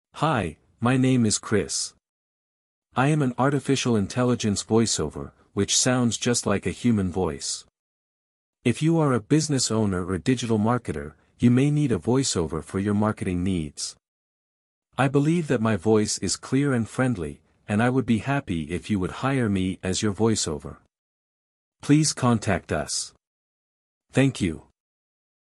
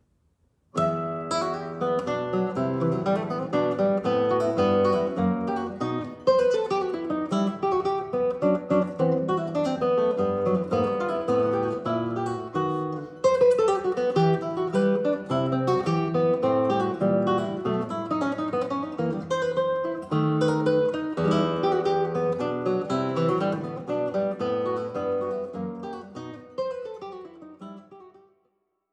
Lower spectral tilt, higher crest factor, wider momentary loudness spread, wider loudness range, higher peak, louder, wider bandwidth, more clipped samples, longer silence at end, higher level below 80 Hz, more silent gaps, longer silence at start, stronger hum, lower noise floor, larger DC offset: second, -5 dB/octave vs -7.5 dB/octave; about the same, 18 dB vs 16 dB; about the same, 10 LU vs 9 LU; about the same, 3 LU vs 5 LU; about the same, -6 dBFS vs -8 dBFS; about the same, -24 LUFS vs -25 LUFS; first, 12 kHz vs 9.8 kHz; neither; about the same, 0.95 s vs 0.85 s; first, -50 dBFS vs -62 dBFS; first, 2.09-2.82 s, 7.79-8.53 s, 14.08-14.82 s, 20.98-21.72 s, 23.27-24.01 s vs none; second, 0.15 s vs 0.75 s; neither; first, under -90 dBFS vs -73 dBFS; neither